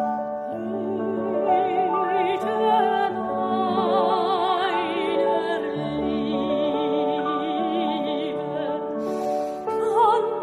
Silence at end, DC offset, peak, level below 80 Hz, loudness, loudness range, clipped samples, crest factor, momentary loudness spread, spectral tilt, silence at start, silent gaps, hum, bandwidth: 0 s; under 0.1%; -8 dBFS; -60 dBFS; -23 LUFS; 3 LU; under 0.1%; 16 dB; 7 LU; -6.5 dB/octave; 0 s; none; none; 12.5 kHz